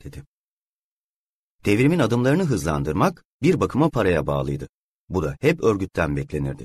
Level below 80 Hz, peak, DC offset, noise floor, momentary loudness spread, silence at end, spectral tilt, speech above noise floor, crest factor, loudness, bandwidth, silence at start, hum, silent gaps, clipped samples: -42 dBFS; -4 dBFS; under 0.1%; under -90 dBFS; 10 LU; 0 s; -7 dB/octave; over 69 dB; 18 dB; -22 LUFS; 13.5 kHz; 0.05 s; none; 0.26-1.59 s, 3.25-3.40 s, 4.69-5.08 s; under 0.1%